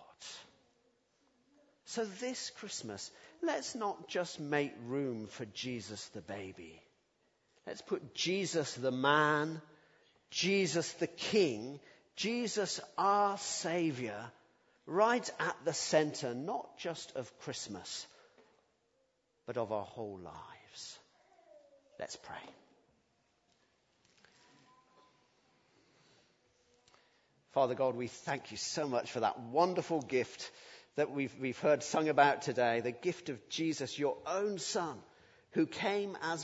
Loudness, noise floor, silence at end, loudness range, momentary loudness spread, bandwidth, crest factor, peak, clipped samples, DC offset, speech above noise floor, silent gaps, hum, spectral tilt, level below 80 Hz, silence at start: -36 LUFS; -77 dBFS; 0 s; 12 LU; 17 LU; 8 kHz; 24 dB; -12 dBFS; under 0.1%; under 0.1%; 42 dB; none; none; -4 dB/octave; -80 dBFS; 0 s